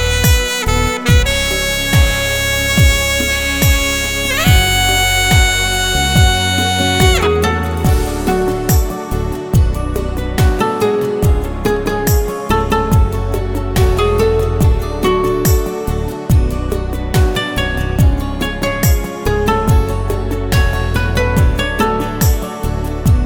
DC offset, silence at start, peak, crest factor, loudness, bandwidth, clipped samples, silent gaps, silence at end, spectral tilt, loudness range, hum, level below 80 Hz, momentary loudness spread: under 0.1%; 0 s; 0 dBFS; 14 dB; -14 LUFS; over 20 kHz; under 0.1%; none; 0 s; -4.5 dB/octave; 4 LU; none; -18 dBFS; 8 LU